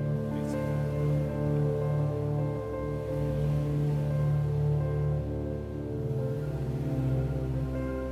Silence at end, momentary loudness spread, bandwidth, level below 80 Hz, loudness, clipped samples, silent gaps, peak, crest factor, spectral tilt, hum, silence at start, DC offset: 0 s; 5 LU; 8.6 kHz; -42 dBFS; -30 LUFS; under 0.1%; none; -16 dBFS; 12 dB; -9.5 dB/octave; none; 0 s; under 0.1%